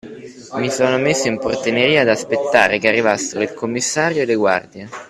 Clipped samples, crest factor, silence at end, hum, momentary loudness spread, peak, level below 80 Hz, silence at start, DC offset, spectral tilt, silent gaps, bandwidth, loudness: under 0.1%; 18 dB; 0.05 s; none; 9 LU; 0 dBFS; -56 dBFS; 0.05 s; under 0.1%; -3.5 dB/octave; none; 13.5 kHz; -17 LUFS